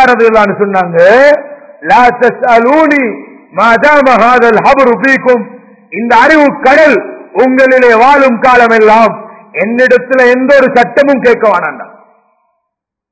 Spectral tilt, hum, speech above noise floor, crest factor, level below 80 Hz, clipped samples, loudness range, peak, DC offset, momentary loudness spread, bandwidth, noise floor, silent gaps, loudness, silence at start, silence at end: -5.5 dB/octave; none; 67 dB; 6 dB; -44 dBFS; 6%; 2 LU; 0 dBFS; under 0.1%; 11 LU; 8 kHz; -73 dBFS; none; -6 LUFS; 0 s; 1.25 s